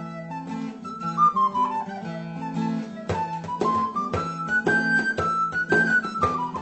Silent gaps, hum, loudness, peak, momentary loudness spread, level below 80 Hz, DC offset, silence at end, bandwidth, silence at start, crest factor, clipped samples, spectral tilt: none; none; -24 LUFS; -8 dBFS; 13 LU; -54 dBFS; under 0.1%; 0 s; 8.4 kHz; 0 s; 16 dB; under 0.1%; -6 dB/octave